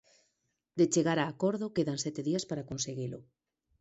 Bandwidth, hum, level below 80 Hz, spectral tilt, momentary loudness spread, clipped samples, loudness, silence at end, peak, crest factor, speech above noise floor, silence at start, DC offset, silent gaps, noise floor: 8.2 kHz; none; -68 dBFS; -5 dB/octave; 12 LU; under 0.1%; -32 LUFS; 0.6 s; -14 dBFS; 18 dB; 49 dB; 0.75 s; under 0.1%; none; -80 dBFS